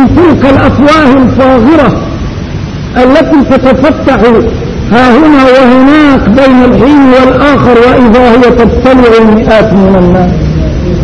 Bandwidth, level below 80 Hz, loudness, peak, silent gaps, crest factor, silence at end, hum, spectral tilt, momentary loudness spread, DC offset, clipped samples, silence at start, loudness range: 9.2 kHz; -18 dBFS; -4 LUFS; 0 dBFS; none; 4 dB; 0 s; none; -7.5 dB/octave; 8 LU; under 0.1%; 10%; 0 s; 3 LU